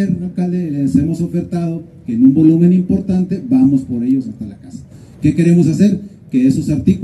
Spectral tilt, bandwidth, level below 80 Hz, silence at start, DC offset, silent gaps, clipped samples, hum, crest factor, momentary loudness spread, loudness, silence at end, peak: -9 dB/octave; 11.5 kHz; -42 dBFS; 0 s; under 0.1%; none; under 0.1%; none; 14 dB; 14 LU; -14 LUFS; 0 s; 0 dBFS